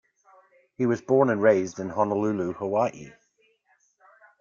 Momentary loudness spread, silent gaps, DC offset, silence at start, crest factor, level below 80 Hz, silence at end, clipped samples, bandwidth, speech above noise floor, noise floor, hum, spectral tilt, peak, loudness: 9 LU; none; under 0.1%; 0.8 s; 20 dB; -68 dBFS; 1.3 s; under 0.1%; 7.4 kHz; 43 dB; -67 dBFS; none; -7.5 dB/octave; -6 dBFS; -25 LUFS